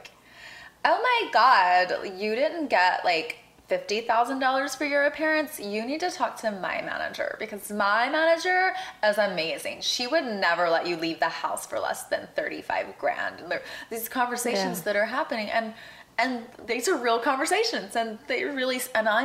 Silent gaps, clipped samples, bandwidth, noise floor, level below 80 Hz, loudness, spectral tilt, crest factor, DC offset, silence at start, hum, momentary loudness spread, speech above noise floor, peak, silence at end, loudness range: none; under 0.1%; 16 kHz; -48 dBFS; -70 dBFS; -26 LUFS; -2.5 dB/octave; 20 dB; under 0.1%; 0 s; none; 9 LU; 22 dB; -6 dBFS; 0 s; 5 LU